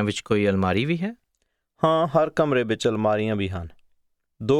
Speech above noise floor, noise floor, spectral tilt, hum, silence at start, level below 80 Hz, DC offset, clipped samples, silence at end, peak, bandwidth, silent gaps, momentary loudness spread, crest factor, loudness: 52 dB; -74 dBFS; -6.5 dB/octave; none; 0 s; -54 dBFS; under 0.1%; under 0.1%; 0 s; -4 dBFS; 12.5 kHz; none; 11 LU; 18 dB; -23 LUFS